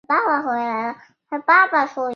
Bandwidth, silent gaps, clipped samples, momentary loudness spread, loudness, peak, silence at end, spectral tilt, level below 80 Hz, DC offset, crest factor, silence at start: 6.8 kHz; none; under 0.1%; 13 LU; -18 LUFS; -2 dBFS; 0 s; -4.5 dB/octave; -76 dBFS; under 0.1%; 18 dB; 0.1 s